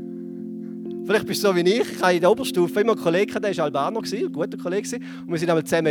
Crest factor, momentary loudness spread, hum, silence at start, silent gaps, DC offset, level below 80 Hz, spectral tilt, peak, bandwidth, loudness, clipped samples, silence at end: 18 dB; 14 LU; none; 0 s; none; under 0.1%; -66 dBFS; -5 dB/octave; -4 dBFS; 19 kHz; -22 LUFS; under 0.1%; 0 s